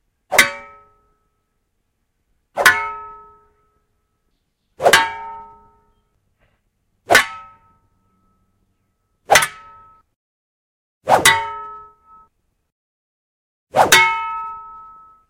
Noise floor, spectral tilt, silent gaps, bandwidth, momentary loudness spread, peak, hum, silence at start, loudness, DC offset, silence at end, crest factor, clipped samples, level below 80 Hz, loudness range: -70 dBFS; -1 dB/octave; 10.16-11.01 s, 12.72-13.67 s; 16 kHz; 23 LU; 0 dBFS; none; 0.3 s; -15 LUFS; under 0.1%; 0.5 s; 22 dB; under 0.1%; -54 dBFS; 4 LU